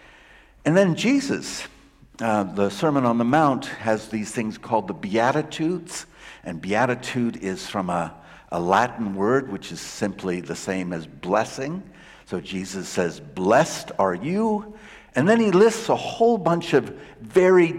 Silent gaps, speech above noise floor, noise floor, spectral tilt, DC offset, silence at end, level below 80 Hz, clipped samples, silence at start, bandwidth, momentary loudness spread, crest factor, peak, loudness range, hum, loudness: none; 28 dB; -51 dBFS; -5.5 dB/octave; under 0.1%; 0 s; -56 dBFS; under 0.1%; 0.65 s; 15.5 kHz; 14 LU; 16 dB; -6 dBFS; 6 LU; none; -23 LUFS